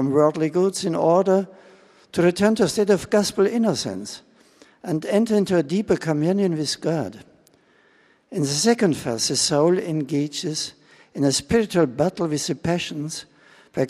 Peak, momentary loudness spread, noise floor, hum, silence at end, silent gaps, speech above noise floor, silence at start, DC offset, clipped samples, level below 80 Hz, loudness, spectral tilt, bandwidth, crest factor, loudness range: -4 dBFS; 12 LU; -58 dBFS; none; 0 s; none; 37 dB; 0 s; under 0.1%; under 0.1%; -54 dBFS; -21 LUFS; -5 dB/octave; 15 kHz; 18 dB; 3 LU